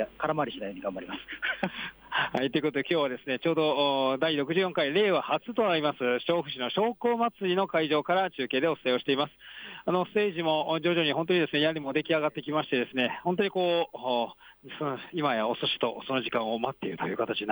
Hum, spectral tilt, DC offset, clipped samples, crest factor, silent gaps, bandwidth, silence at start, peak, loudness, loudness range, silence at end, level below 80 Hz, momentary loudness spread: none; -7 dB/octave; under 0.1%; under 0.1%; 14 dB; none; over 20 kHz; 0 s; -14 dBFS; -28 LUFS; 3 LU; 0 s; -68 dBFS; 8 LU